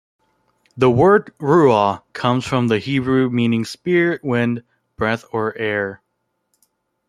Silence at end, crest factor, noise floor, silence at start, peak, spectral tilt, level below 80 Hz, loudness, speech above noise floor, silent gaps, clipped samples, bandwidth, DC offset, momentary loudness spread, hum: 1.15 s; 18 dB; -72 dBFS; 0.75 s; -2 dBFS; -7 dB/octave; -54 dBFS; -18 LUFS; 55 dB; none; under 0.1%; 12.5 kHz; under 0.1%; 9 LU; none